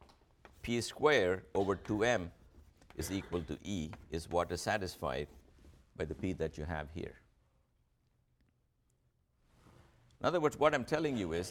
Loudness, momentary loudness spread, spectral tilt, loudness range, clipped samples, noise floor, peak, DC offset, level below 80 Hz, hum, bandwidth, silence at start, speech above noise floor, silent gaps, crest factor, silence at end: -36 LUFS; 14 LU; -5 dB/octave; 11 LU; under 0.1%; -76 dBFS; -14 dBFS; under 0.1%; -56 dBFS; none; 17 kHz; 0 s; 41 dB; none; 22 dB; 0 s